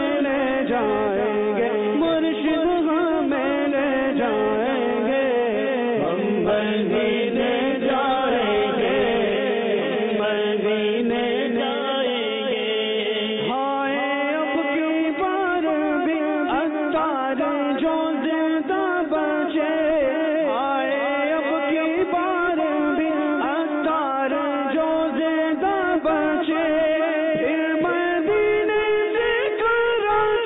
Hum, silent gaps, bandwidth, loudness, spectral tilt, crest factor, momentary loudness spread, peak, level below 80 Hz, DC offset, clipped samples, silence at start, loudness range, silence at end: none; none; 4 kHz; -21 LUFS; -9.5 dB/octave; 10 dB; 2 LU; -12 dBFS; -56 dBFS; under 0.1%; under 0.1%; 0 s; 2 LU; 0 s